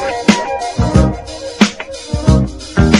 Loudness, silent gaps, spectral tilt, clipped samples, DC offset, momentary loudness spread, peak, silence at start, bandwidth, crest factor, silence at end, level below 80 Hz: -15 LUFS; none; -5.5 dB/octave; 0.4%; under 0.1%; 11 LU; 0 dBFS; 0 s; 11.5 kHz; 14 dB; 0 s; -22 dBFS